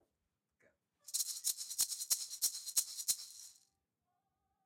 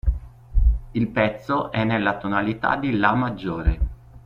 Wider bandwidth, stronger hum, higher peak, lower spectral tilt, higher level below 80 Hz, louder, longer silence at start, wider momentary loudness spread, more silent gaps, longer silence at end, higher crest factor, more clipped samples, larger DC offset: first, 16.5 kHz vs 5.4 kHz; neither; second, -20 dBFS vs -2 dBFS; second, 4 dB/octave vs -8.5 dB/octave; second, -86 dBFS vs -26 dBFS; second, -36 LUFS vs -23 LUFS; first, 1.05 s vs 0.05 s; first, 11 LU vs 8 LU; neither; first, 1.15 s vs 0.05 s; about the same, 24 dB vs 20 dB; neither; neither